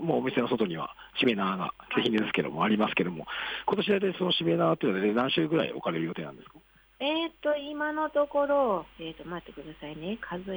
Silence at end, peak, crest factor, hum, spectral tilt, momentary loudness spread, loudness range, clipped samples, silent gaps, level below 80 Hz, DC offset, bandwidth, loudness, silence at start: 0 s; -14 dBFS; 16 dB; none; -7.5 dB/octave; 13 LU; 3 LU; under 0.1%; none; -62 dBFS; under 0.1%; over 20 kHz; -28 LUFS; 0 s